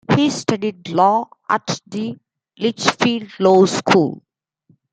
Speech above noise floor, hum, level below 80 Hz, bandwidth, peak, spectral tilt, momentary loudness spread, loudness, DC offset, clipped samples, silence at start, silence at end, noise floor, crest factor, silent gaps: 42 dB; none; -60 dBFS; 9.4 kHz; 0 dBFS; -5 dB/octave; 11 LU; -18 LUFS; under 0.1%; under 0.1%; 0.1 s; 0.75 s; -59 dBFS; 18 dB; none